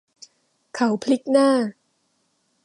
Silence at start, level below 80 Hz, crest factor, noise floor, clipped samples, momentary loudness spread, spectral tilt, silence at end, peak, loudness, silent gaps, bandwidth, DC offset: 0.75 s; -76 dBFS; 18 dB; -69 dBFS; under 0.1%; 11 LU; -5 dB/octave; 0.95 s; -6 dBFS; -21 LUFS; none; 11.5 kHz; under 0.1%